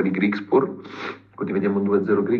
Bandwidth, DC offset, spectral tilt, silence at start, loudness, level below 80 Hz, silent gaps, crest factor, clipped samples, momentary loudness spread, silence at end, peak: 6.4 kHz; under 0.1%; -9 dB/octave; 0 s; -22 LUFS; -74 dBFS; none; 16 dB; under 0.1%; 13 LU; 0 s; -6 dBFS